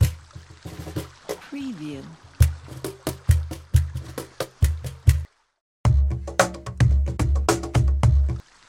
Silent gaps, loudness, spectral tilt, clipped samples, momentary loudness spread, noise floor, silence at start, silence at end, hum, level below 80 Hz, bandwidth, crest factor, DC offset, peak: 5.61-5.84 s; -24 LUFS; -6 dB/octave; under 0.1%; 15 LU; -44 dBFS; 0 s; 0.3 s; none; -26 dBFS; 16.5 kHz; 20 dB; under 0.1%; -2 dBFS